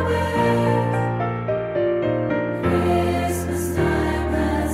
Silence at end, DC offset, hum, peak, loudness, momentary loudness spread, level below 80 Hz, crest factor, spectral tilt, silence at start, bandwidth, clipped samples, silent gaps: 0 s; under 0.1%; none; -6 dBFS; -21 LUFS; 4 LU; -34 dBFS; 14 dB; -6.5 dB/octave; 0 s; 16 kHz; under 0.1%; none